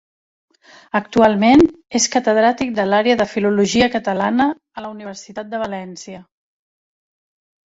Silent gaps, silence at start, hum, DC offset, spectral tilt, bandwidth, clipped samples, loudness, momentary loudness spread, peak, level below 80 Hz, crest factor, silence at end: none; 0.95 s; none; under 0.1%; -4 dB/octave; 8 kHz; under 0.1%; -16 LUFS; 18 LU; 0 dBFS; -48 dBFS; 18 dB; 1.45 s